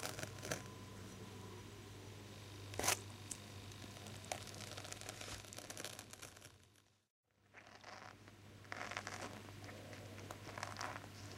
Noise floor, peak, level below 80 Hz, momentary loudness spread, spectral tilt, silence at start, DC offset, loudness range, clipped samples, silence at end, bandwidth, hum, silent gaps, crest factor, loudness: -71 dBFS; -18 dBFS; -70 dBFS; 12 LU; -2.5 dB/octave; 0 s; under 0.1%; 8 LU; under 0.1%; 0 s; 16 kHz; none; 7.10-7.23 s; 32 dB; -48 LUFS